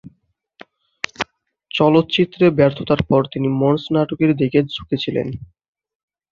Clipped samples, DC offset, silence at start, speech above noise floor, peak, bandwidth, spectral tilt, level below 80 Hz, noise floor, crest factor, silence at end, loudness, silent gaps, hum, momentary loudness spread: under 0.1%; under 0.1%; 0.05 s; 46 dB; -2 dBFS; 7.4 kHz; -7.5 dB/octave; -48 dBFS; -63 dBFS; 18 dB; 0.85 s; -18 LUFS; none; none; 14 LU